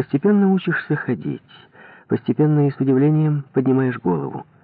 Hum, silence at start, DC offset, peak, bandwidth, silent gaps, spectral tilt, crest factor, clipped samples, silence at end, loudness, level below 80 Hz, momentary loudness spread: none; 0 s; under 0.1%; -8 dBFS; 4.5 kHz; none; -12.5 dB/octave; 12 dB; under 0.1%; 0.2 s; -19 LUFS; -66 dBFS; 9 LU